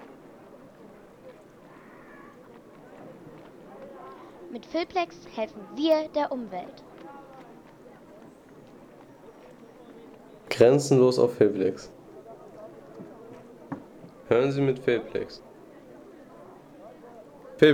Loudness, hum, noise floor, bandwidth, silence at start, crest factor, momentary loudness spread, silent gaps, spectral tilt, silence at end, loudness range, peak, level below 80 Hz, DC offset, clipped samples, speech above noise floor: -25 LUFS; none; -50 dBFS; 16 kHz; 1.25 s; 24 dB; 28 LU; none; -6 dB/octave; 0 s; 24 LU; -6 dBFS; -66 dBFS; under 0.1%; under 0.1%; 26 dB